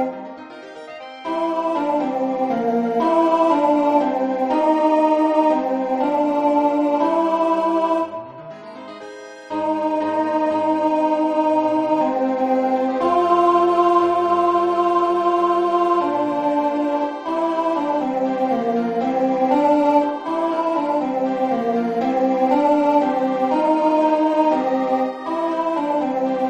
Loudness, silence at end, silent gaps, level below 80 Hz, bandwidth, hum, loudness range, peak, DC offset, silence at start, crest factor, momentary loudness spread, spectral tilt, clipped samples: -19 LUFS; 0 s; none; -64 dBFS; 9.4 kHz; none; 4 LU; -4 dBFS; under 0.1%; 0 s; 14 dB; 7 LU; -6.5 dB/octave; under 0.1%